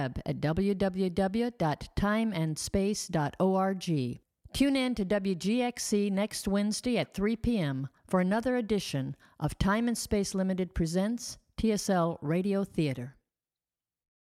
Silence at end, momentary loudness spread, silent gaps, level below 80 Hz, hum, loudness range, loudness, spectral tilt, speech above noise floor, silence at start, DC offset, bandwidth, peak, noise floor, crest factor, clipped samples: 1.2 s; 6 LU; none; -48 dBFS; none; 1 LU; -30 LUFS; -5.5 dB/octave; over 61 dB; 0 s; under 0.1%; 15.5 kHz; -14 dBFS; under -90 dBFS; 16 dB; under 0.1%